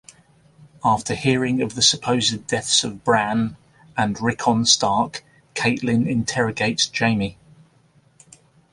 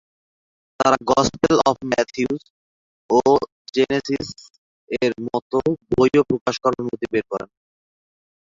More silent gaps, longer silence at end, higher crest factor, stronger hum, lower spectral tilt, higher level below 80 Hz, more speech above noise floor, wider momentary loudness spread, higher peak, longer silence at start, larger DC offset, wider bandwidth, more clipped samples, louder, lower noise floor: second, none vs 2.50-3.09 s, 3.52-3.65 s, 4.50-4.87 s, 5.42-5.50 s, 6.41-6.46 s; first, 1.4 s vs 1.1 s; about the same, 20 dB vs 20 dB; neither; second, -3.5 dB/octave vs -5 dB/octave; about the same, -54 dBFS vs -52 dBFS; second, 37 dB vs over 70 dB; about the same, 9 LU vs 10 LU; about the same, -2 dBFS vs -2 dBFS; about the same, 0.85 s vs 0.8 s; neither; first, 11.5 kHz vs 7.6 kHz; neither; about the same, -20 LUFS vs -20 LUFS; second, -57 dBFS vs under -90 dBFS